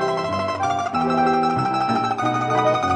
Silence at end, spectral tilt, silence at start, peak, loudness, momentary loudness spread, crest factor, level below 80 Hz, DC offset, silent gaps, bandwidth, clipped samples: 0 s; -5.5 dB/octave; 0 s; -6 dBFS; -21 LUFS; 4 LU; 14 dB; -56 dBFS; under 0.1%; none; 10.5 kHz; under 0.1%